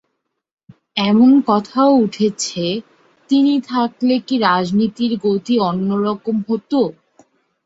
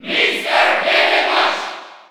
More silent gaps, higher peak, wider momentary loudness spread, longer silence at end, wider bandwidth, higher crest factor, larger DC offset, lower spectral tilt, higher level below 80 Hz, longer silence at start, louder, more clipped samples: neither; about the same, 0 dBFS vs -2 dBFS; second, 9 LU vs 12 LU; first, 0.75 s vs 0.1 s; second, 8 kHz vs 18 kHz; about the same, 16 dB vs 14 dB; neither; first, -5.5 dB/octave vs -1.5 dB/octave; first, -60 dBFS vs -68 dBFS; first, 0.95 s vs 0.05 s; second, -17 LUFS vs -14 LUFS; neither